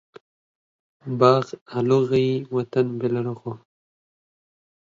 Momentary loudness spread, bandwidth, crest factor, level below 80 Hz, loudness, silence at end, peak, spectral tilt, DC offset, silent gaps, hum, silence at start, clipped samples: 17 LU; 7.6 kHz; 22 dB; -66 dBFS; -22 LUFS; 1.4 s; -2 dBFS; -8 dB/octave; under 0.1%; 1.61-1.66 s; none; 1.05 s; under 0.1%